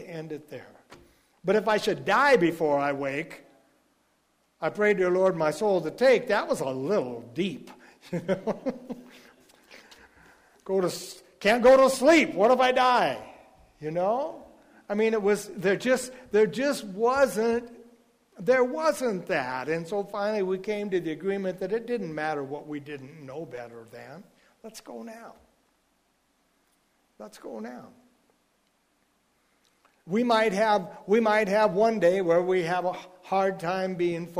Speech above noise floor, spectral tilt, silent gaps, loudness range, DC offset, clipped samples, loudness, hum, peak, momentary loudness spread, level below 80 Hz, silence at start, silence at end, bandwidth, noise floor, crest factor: 45 dB; -5 dB/octave; none; 23 LU; under 0.1%; under 0.1%; -25 LUFS; none; -10 dBFS; 20 LU; -64 dBFS; 0 s; 0 s; 15.5 kHz; -70 dBFS; 18 dB